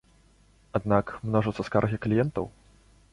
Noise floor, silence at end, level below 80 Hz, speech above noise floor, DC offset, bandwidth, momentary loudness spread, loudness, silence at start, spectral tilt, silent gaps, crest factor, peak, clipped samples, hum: -60 dBFS; 0.65 s; -52 dBFS; 34 dB; under 0.1%; 11 kHz; 8 LU; -27 LUFS; 0.75 s; -8.5 dB/octave; none; 22 dB; -8 dBFS; under 0.1%; none